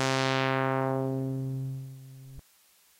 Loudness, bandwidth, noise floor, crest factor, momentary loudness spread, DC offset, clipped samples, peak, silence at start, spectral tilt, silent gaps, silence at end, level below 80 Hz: -30 LUFS; 16.5 kHz; -63 dBFS; 22 dB; 21 LU; under 0.1%; under 0.1%; -10 dBFS; 0 s; -5.5 dB/octave; none; 0.6 s; -64 dBFS